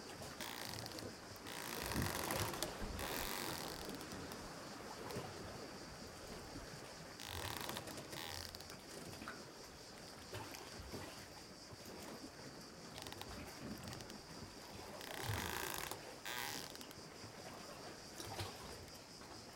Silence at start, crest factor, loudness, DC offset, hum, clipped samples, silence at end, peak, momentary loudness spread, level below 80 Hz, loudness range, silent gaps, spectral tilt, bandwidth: 0 s; 30 dB; -48 LUFS; under 0.1%; none; under 0.1%; 0 s; -20 dBFS; 11 LU; -62 dBFS; 8 LU; none; -3 dB/octave; 17 kHz